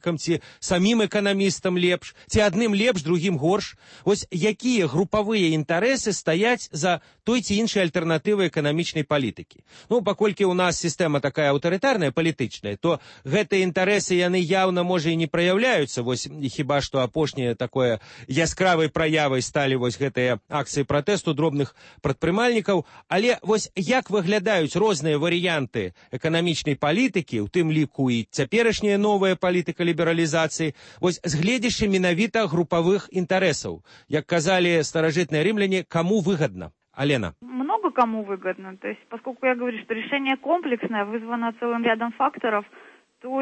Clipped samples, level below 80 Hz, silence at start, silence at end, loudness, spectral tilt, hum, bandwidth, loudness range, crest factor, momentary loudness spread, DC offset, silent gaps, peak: under 0.1%; -52 dBFS; 0 s; 0 s; -23 LUFS; -5 dB/octave; none; 8.8 kHz; 3 LU; 16 dB; 7 LU; under 0.1%; none; -8 dBFS